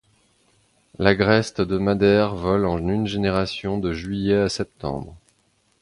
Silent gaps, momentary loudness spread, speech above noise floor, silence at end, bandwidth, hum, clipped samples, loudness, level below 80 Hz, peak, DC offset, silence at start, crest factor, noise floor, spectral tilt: none; 11 LU; 44 dB; 0.65 s; 11.5 kHz; none; under 0.1%; -21 LUFS; -42 dBFS; -2 dBFS; under 0.1%; 1 s; 20 dB; -65 dBFS; -6.5 dB/octave